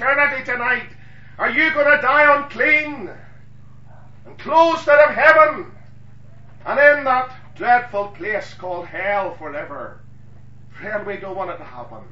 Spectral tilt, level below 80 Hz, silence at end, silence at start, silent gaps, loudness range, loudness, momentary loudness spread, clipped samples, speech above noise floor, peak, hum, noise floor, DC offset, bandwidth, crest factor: -5 dB/octave; -54 dBFS; 0.1 s; 0 s; none; 11 LU; -16 LUFS; 21 LU; under 0.1%; 28 dB; 0 dBFS; 50 Hz at -55 dBFS; -45 dBFS; 1%; 7.6 kHz; 20 dB